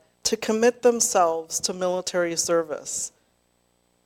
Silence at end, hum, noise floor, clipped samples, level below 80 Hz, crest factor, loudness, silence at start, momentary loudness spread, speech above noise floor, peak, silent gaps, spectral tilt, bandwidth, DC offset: 1 s; 60 Hz at -55 dBFS; -67 dBFS; under 0.1%; -64 dBFS; 18 dB; -23 LUFS; 0.25 s; 9 LU; 44 dB; -6 dBFS; none; -2 dB/octave; 16.5 kHz; under 0.1%